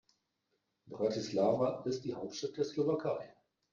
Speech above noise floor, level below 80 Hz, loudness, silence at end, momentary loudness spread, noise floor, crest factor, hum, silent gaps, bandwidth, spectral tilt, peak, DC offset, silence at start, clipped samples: 48 dB; -74 dBFS; -35 LUFS; 0.4 s; 10 LU; -82 dBFS; 18 dB; none; none; 7.6 kHz; -6 dB/octave; -18 dBFS; under 0.1%; 0.85 s; under 0.1%